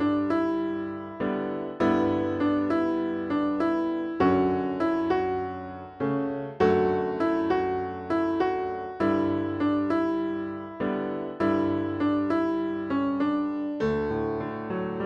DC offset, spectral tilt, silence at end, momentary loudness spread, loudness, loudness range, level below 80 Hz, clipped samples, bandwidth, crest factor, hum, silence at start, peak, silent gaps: under 0.1%; -8.5 dB/octave; 0 s; 8 LU; -27 LUFS; 2 LU; -56 dBFS; under 0.1%; 6.8 kHz; 18 dB; none; 0 s; -8 dBFS; none